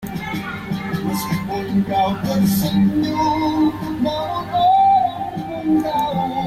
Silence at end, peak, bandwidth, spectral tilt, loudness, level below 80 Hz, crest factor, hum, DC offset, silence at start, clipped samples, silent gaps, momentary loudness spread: 0 s; -8 dBFS; 16 kHz; -6 dB/octave; -19 LUFS; -44 dBFS; 12 dB; none; under 0.1%; 0 s; under 0.1%; none; 11 LU